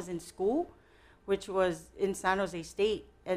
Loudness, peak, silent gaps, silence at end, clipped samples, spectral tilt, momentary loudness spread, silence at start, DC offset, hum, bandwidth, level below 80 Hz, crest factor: -33 LUFS; -14 dBFS; none; 0 s; under 0.1%; -4.5 dB/octave; 9 LU; 0 s; under 0.1%; none; 15 kHz; -58 dBFS; 20 dB